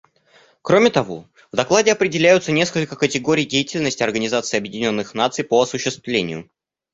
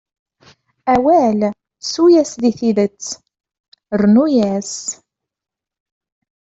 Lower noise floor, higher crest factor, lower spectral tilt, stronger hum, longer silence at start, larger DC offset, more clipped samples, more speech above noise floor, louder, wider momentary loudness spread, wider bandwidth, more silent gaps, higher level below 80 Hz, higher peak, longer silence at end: about the same, -54 dBFS vs -51 dBFS; about the same, 18 dB vs 14 dB; second, -4 dB/octave vs -5.5 dB/octave; neither; second, 0.65 s vs 0.85 s; neither; neither; about the same, 36 dB vs 37 dB; second, -19 LUFS vs -15 LUFS; second, 9 LU vs 15 LU; about the same, 8 kHz vs 8.2 kHz; second, none vs 3.60-3.72 s; about the same, -58 dBFS vs -54 dBFS; about the same, 0 dBFS vs -2 dBFS; second, 0.5 s vs 1.65 s